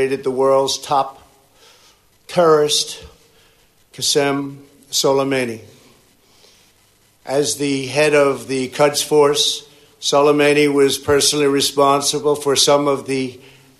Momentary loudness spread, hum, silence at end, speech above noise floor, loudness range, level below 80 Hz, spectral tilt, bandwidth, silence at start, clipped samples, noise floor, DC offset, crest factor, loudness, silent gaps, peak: 10 LU; none; 0.45 s; 39 dB; 6 LU; -56 dBFS; -3 dB/octave; 13.5 kHz; 0 s; under 0.1%; -55 dBFS; under 0.1%; 16 dB; -16 LUFS; none; -2 dBFS